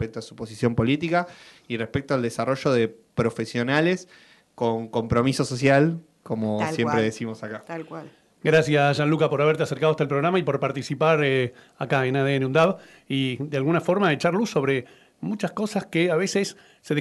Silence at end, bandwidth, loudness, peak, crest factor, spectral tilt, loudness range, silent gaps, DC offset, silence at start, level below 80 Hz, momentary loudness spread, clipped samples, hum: 0 s; 12 kHz; -23 LUFS; -6 dBFS; 16 dB; -6 dB/octave; 3 LU; none; under 0.1%; 0 s; -56 dBFS; 12 LU; under 0.1%; none